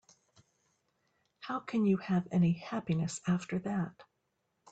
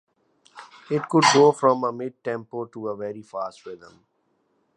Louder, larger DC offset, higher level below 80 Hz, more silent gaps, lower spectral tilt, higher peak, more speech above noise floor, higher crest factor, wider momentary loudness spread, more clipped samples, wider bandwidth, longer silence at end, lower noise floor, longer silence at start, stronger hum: second, -33 LUFS vs -22 LUFS; neither; about the same, -70 dBFS vs -74 dBFS; neither; first, -7 dB/octave vs -4 dB/octave; second, -20 dBFS vs -4 dBFS; about the same, 49 dB vs 47 dB; second, 16 dB vs 22 dB; second, 10 LU vs 18 LU; neither; second, 9 kHz vs 10 kHz; second, 0.7 s vs 1 s; first, -81 dBFS vs -69 dBFS; first, 1.4 s vs 0.55 s; neither